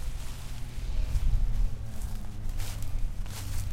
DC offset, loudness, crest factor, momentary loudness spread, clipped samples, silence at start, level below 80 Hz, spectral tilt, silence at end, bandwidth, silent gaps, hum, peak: under 0.1%; -36 LUFS; 14 dB; 9 LU; under 0.1%; 0 s; -30 dBFS; -5 dB/octave; 0 s; 16 kHz; none; none; -14 dBFS